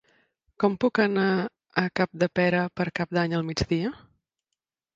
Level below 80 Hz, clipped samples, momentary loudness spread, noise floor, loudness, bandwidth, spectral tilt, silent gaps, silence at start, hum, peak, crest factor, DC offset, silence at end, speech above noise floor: -52 dBFS; under 0.1%; 6 LU; -85 dBFS; -26 LUFS; 7.8 kHz; -6.5 dB/octave; none; 0.6 s; none; -6 dBFS; 20 dB; under 0.1%; 1 s; 60 dB